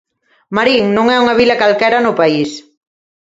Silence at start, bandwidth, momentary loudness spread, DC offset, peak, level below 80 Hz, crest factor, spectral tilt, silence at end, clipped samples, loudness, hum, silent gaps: 0.5 s; 7.8 kHz; 9 LU; under 0.1%; 0 dBFS; -50 dBFS; 14 dB; -5 dB/octave; 0.65 s; under 0.1%; -12 LUFS; none; none